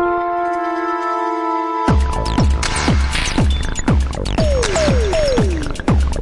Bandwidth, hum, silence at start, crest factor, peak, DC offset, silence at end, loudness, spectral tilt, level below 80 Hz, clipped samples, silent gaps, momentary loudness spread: 11.5 kHz; none; 0 s; 14 dB; -2 dBFS; under 0.1%; 0 s; -17 LUFS; -5.5 dB/octave; -20 dBFS; under 0.1%; none; 4 LU